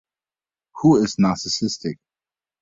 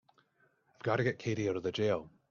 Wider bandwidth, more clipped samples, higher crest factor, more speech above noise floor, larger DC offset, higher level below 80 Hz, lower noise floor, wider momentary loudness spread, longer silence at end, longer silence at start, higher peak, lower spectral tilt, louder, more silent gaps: about the same, 7.8 kHz vs 7.2 kHz; neither; about the same, 18 dB vs 20 dB; first, over 71 dB vs 39 dB; neither; first, -56 dBFS vs -70 dBFS; first, under -90 dBFS vs -72 dBFS; first, 14 LU vs 4 LU; first, 0.7 s vs 0.25 s; about the same, 0.75 s vs 0.85 s; first, -4 dBFS vs -16 dBFS; about the same, -5.5 dB/octave vs -6 dB/octave; first, -20 LUFS vs -34 LUFS; neither